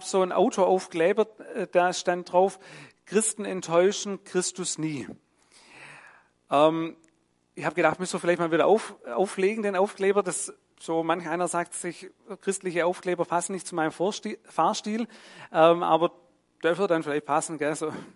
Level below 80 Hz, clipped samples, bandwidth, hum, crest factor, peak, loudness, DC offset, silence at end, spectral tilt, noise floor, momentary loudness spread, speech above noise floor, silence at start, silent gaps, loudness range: -76 dBFS; under 0.1%; 11.5 kHz; none; 22 dB; -6 dBFS; -26 LUFS; under 0.1%; 0.05 s; -4 dB/octave; -68 dBFS; 12 LU; 42 dB; 0 s; none; 4 LU